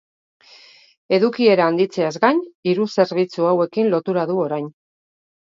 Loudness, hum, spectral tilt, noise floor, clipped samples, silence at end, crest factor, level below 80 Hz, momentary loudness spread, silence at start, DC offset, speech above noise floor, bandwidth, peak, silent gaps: -19 LUFS; none; -6.5 dB/octave; -48 dBFS; under 0.1%; 0.85 s; 18 dB; -70 dBFS; 7 LU; 1.1 s; under 0.1%; 30 dB; 7.6 kHz; -2 dBFS; 2.55-2.63 s